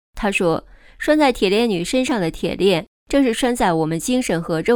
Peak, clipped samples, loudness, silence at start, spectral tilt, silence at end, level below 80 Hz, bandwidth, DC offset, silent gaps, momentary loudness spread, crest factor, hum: -4 dBFS; under 0.1%; -19 LUFS; 0.15 s; -5 dB/octave; 0 s; -42 dBFS; 18.5 kHz; under 0.1%; 2.87-3.06 s; 6 LU; 16 dB; none